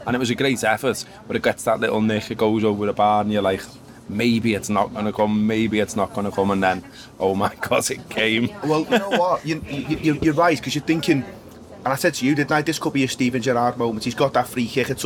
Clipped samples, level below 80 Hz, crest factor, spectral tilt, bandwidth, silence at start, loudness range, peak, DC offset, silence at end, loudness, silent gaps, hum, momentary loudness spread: under 0.1%; -52 dBFS; 16 dB; -5 dB/octave; 19.5 kHz; 0 s; 1 LU; -4 dBFS; under 0.1%; 0 s; -21 LUFS; none; none; 6 LU